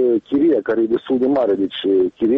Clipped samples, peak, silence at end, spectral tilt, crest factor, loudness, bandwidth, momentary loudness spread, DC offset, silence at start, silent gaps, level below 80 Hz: under 0.1%; -8 dBFS; 0 s; -8.5 dB/octave; 8 dB; -18 LUFS; 4.4 kHz; 3 LU; under 0.1%; 0 s; none; -58 dBFS